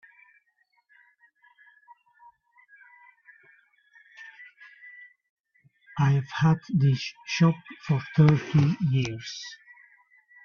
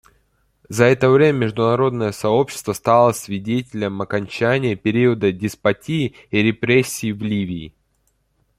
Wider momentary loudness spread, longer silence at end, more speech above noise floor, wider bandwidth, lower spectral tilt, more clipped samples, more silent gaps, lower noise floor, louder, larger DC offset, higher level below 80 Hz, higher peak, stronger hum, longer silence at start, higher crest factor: first, 26 LU vs 9 LU; about the same, 0.9 s vs 0.9 s; about the same, 47 dB vs 47 dB; second, 7 kHz vs 15.5 kHz; about the same, -7 dB/octave vs -6 dB/octave; neither; first, 5.30-5.36 s vs none; first, -71 dBFS vs -65 dBFS; second, -25 LUFS vs -19 LUFS; neither; second, -60 dBFS vs -54 dBFS; second, -4 dBFS vs 0 dBFS; neither; first, 4.2 s vs 0.7 s; first, 24 dB vs 18 dB